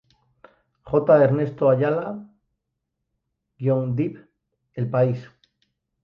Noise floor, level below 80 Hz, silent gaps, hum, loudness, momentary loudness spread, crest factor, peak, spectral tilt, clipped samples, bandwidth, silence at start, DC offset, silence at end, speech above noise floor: -80 dBFS; -60 dBFS; none; none; -22 LUFS; 16 LU; 20 dB; -4 dBFS; -11 dB/octave; under 0.1%; 5.6 kHz; 0.85 s; under 0.1%; 0.8 s; 60 dB